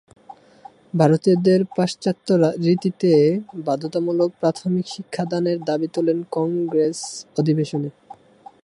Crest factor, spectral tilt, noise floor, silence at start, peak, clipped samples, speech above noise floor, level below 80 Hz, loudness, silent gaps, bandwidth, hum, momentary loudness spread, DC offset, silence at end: 18 dB; -7 dB/octave; -47 dBFS; 0.3 s; -2 dBFS; under 0.1%; 27 dB; -66 dBFS; -21 LUFS; none; 11.5 kHz; none; 9 LU; under 0.1%; 0.75 s